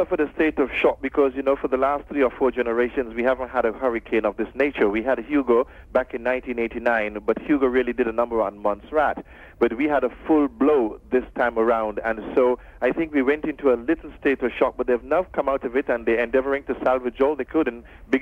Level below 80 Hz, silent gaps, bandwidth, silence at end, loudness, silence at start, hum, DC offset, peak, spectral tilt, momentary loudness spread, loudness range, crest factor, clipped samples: -46 dBFS; none; 6.2 kHz; 0 s; -23 LUFS; 0 s; none; under 0.1%; -6 dBFS; -7.5 dB/octave; 5 LU; 1 LU; 16 dB; under 0.1%